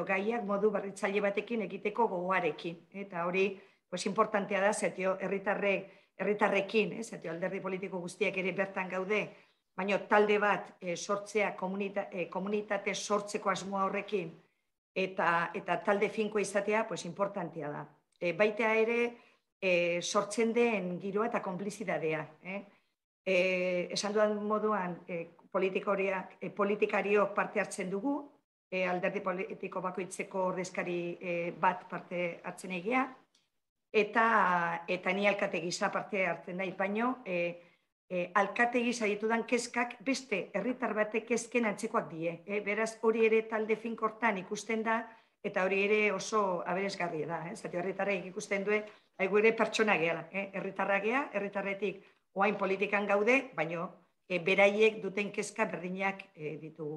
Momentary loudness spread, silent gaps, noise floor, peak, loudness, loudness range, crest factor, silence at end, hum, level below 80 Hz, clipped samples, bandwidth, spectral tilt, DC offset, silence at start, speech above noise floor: 10 LU; 14.78-14.95 s, 19.52-19.60 s, 23.04-23.24 s, 28.44-28.71 s, 33.69-33.76 s, 37.92-38.08 s; -71 dBFS; -12 dBFS; -32 LUFS; 4 LU; 22 dB; 0 s; none; -82 dBFS; under 0.1%; 12 kHz; -4.5 dB/octave; under 0.1%; 0 s; 39 dB